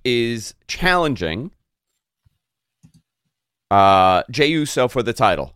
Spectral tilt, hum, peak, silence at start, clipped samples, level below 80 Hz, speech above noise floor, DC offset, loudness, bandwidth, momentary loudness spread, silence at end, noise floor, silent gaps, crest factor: -4.5 dB/octave; none; -2 dBFS; 0.05 s; under 0.1%; -42 dBFS; 61 dB; under 0.1%; -18 LUFS; 16 kHz; 15 LU; 0.05 s; -79 dBFS; none; 18 dB